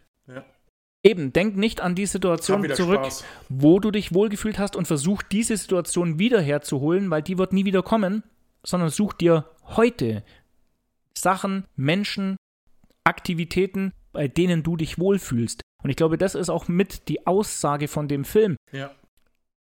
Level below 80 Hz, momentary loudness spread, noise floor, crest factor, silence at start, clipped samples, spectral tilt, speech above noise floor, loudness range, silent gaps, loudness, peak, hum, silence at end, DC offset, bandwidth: -50 dBFS; 10 LU; -70 dBFS; 22 dB; 0.3 s; under 0.1%; -5.5 dB/octave; 48 dB; 4 LU; 0.69-1.04 s, 12.38-12.67 s, 15.63-15.79 s, 18.57-18.67 s; -23 LUFS; 0 dBFS; none; 0.7 s; under 0.1%; 17 kHz